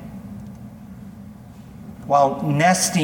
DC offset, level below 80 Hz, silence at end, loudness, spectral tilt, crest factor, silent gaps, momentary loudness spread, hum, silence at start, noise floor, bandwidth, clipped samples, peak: under 0.1%; -52 dBFS; 0 s; -18 LUFS; -4.5 dB/octave; 18 dB; none; 24 LU; none; 0 s; -40 dBFS; 19 kHz; under 0.1%; -4 dBFS